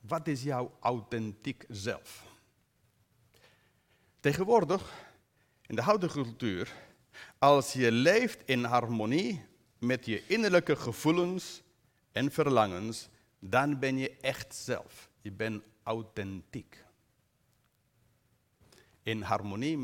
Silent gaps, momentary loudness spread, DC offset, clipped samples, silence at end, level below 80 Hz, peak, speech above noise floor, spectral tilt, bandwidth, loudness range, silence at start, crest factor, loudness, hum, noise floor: none; 17 LU; under 0.1%; under 0.1%; 0 s; -68 dBFS; -10 dBFS; 42 dB; -5.5 dB/octave; 17.5 kHz; 13 LU; 0.05 s; 22 dB; -31 LUFS; none; -72 dBFS